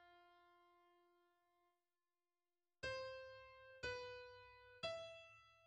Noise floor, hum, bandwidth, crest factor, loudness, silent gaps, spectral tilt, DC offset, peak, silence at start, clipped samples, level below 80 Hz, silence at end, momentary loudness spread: under -90 dBFS; none; 9.4 kHz; 22 dB; -52 LUFS; none; -3 dB/octave; under 0.1%; -34 dBFS; 0 s; under 0.1%; -76 dBFS; 0 s; 14 LU